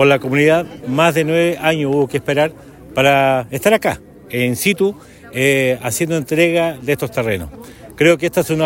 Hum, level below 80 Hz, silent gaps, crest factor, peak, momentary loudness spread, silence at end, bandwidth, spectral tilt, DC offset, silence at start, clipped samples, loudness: none; -48 dBFS; none; 16 dB; 0 dBFS; 8 LU; 0 s; 16.5 kHz; -5 dB/octave; under 0.1%; 0 s; under 0.1%; -16 LUFS